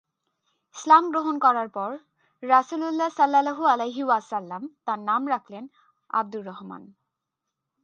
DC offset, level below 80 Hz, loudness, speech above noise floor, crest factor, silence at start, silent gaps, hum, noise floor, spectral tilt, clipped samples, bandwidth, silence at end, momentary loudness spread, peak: under 0.1%; -84 dBFS; -23 LUFS; 60 dB; 22 dB; 0.75 s; none; none; -84 dBFS; -4.5 dB/octave; under 0.1%; 8.8 kHz; 0.95 s; 20 LU; -4 dBFS